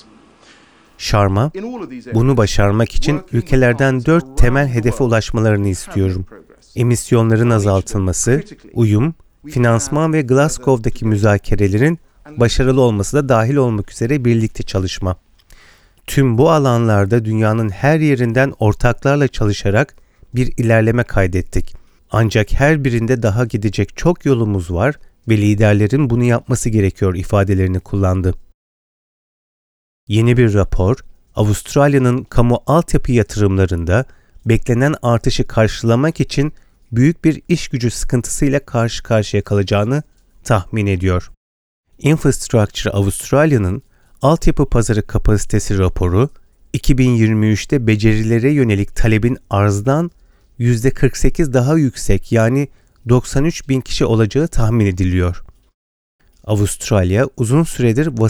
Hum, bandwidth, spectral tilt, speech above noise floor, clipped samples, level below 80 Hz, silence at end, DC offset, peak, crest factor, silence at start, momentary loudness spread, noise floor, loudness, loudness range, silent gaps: none; 15 kHz; -6.5 dB/octave; 33 dB; under 0.1%; -26 dBFS; 0 s; under 0.1%; 0 dBFS; 14 dB; 1 s; 7 LU; -47 dBFS; -16 LUFS; 3 LU; 28.54-30.07 s, 41.37-41.84 s, 55.74-56.19 s